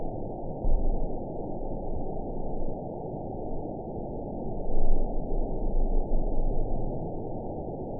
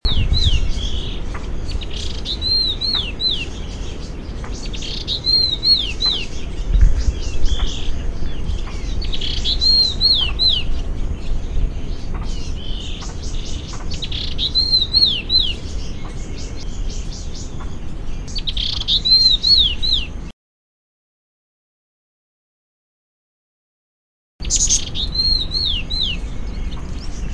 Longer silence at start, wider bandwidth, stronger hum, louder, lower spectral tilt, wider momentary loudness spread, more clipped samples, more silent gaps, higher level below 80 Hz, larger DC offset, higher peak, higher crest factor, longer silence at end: about the same, 0 s vs 0.05 s; second, 1 kHz vs 10.5 kHz; neither; second, -35 LUFS vs -17 LUFS; first, -16 dB/octave vs -2.5 dB/octave; second, 4 LU vs 18 LU; neither; second, none vs 20.33-24.39 s; about the same, -28 dBFS vs -24 dBFS; first, 0.4% vs under 0.1%; second, -10 dBFS vs -2 dBFS; about the same, 16 dB vs 16 dB; about the same, 0 s vs 0 s